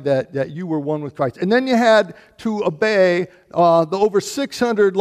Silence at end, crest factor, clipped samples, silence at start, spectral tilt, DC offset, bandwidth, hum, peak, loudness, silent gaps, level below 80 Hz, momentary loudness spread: 0 s; 14 dB; under 0.1%; 0 s; -5.5 dB/octave; under 0.1%; 15 kHz; none; -4 dBFS; -18 LUFS; none; -60 dBFS; 10 LU